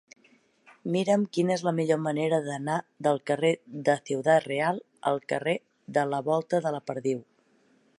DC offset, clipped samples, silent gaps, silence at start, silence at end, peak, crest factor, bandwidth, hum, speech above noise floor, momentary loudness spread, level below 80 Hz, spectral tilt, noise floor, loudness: under 0.1%; under 0.1%; none; 0.85 s; 0.75 s; -10 dBFS; 18 dB; 11.5 kHz; none; 38 dB; 7 LU; -78 dBFS; -6 dB/octave; -65 dBFS; -28 LUFS